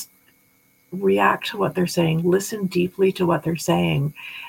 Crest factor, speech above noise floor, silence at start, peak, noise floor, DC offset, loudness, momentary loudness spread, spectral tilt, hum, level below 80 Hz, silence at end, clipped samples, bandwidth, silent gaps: 16 dB; 39 dB; 0 s; -6 dBFS; -60 dBFS; under 0.1%; -21 LUFS; 6 LU; -6 dB/octave; none; -58 dBFS; 0 s; under 0.1%; 17 kHz; none